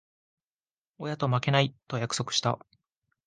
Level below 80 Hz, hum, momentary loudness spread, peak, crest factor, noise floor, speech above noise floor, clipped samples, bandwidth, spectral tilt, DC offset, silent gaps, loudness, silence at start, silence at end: -66 dBFS; none; 12 LU; -8 dBFS; 22 dB; under -90 dBFS; over 62 dB; under 0.1%; 9.8 kHz; -4.5 dB/octave; under 0.1%; none; -28 LUFS; 1 s; 0.7 s